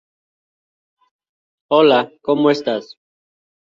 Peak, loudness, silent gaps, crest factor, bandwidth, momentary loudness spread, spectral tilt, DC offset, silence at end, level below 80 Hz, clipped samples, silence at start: -2 dBFS; -16 LUFS; none; 18 dB; 7.4 kHz; 10 LU; -6 dB/octave; under 0.1%; 0.8 s; -66 dBFS; under 0.1%; 1.7 s